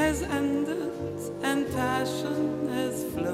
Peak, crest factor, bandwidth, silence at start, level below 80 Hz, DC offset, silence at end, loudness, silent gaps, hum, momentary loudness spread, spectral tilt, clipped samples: -12 dBFS; 16 dB; 16 kHz; 0 s; -48 dBFS; under 0.1%; 0 s; -29 LUFS; none; none; 5 LU; -5 dB/octave; under 0.1%